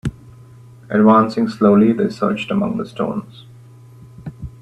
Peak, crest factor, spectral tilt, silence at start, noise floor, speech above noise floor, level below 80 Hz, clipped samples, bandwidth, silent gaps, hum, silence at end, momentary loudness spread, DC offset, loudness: 0 dBFS; 18 dB; -8 dB/octave; 0.05 s; -42 dBFS; 26 dB; -46 dBFS; under 0.1%; 8.6 kHz; none; none; 0.15 s; 21 LU; under 0.1%; -16 LUFS